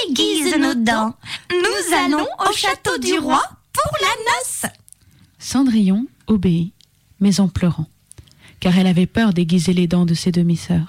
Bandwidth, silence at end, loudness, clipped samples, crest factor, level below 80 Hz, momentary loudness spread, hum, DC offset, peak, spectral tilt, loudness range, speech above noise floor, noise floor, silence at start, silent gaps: 16 kHz; 0 s; -18 LUFS; under 0.1%; 10 dB; -44 dBFS; 7 LU; none; under 0.1%; -8 dBFS; -5 dB/octave; 2 LU; 33 dB; -50 dBFS; 0 s; none